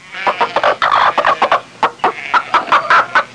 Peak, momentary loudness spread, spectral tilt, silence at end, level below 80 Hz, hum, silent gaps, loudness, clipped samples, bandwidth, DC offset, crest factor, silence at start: -2 dBFS; 6 LU; -2.5 dB/octave; 0 s; -54 dBFS; none; none; -13 LUFS; under 0.1%; 10.5 kHz; under 0.1%; 12 dB; 0.05 s